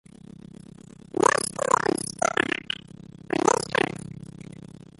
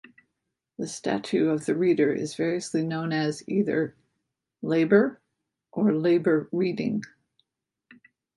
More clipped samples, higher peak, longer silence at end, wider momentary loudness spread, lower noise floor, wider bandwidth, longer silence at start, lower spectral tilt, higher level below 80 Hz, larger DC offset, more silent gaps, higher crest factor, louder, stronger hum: neither; first, -4 dBFS vs -8 dBFS; second, 0.35 s vs 1.3 s; first, 23 LU vs 12 LU; second, -47 dBFS vs -82 dBFS; about the same, 12 kHz vs 11.5 kHz; first, 1.15 s vs 0.8 s; second, -3 dB/octave vs -6.5 dB/octave; first, -58 dBFS vs -70 dBFS; neither; neither; about the same, 24 dB vs 20 dB; about the same, -25 LUFS vs -25 LUFS; neither